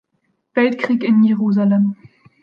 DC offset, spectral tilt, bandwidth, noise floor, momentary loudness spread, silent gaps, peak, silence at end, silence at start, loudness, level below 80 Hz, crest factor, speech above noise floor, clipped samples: under 0.1%; -9 dB/octave; 5.4 kHz; -68 dBFS; 8 LU; none; -4 dBFS; 0.5 s; 0.55 s; -16 LUFS; -70 dBFS; 14 dB; 53 dB; under 0.1%